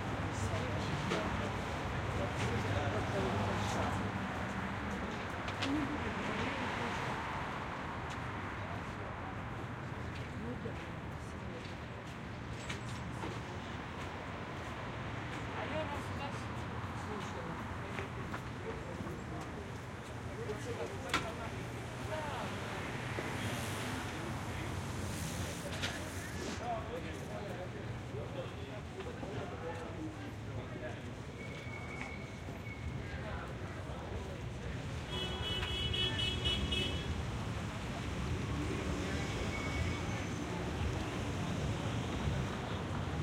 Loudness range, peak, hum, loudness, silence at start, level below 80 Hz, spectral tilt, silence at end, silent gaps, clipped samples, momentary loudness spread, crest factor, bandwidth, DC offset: 7 LU; -16 dBFS; none; -40 LUFS; 0 s; -50 dBFS; -5 dB/octave; 0 s; none; under 0.1%; 8 LU; 24 dB; 16.5 kHz; under 0.1%